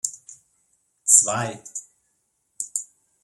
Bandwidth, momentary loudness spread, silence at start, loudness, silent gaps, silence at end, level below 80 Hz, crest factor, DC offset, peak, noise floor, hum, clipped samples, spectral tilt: 16 kHz; 21 LU; 0.05 s; -20 LUFS; none; 0.4 s; -72 dBFS; 26 dB; under 0.1%; 0 dBFS; -72 dBFS; none; under 0.1%; -1.5 dB/octave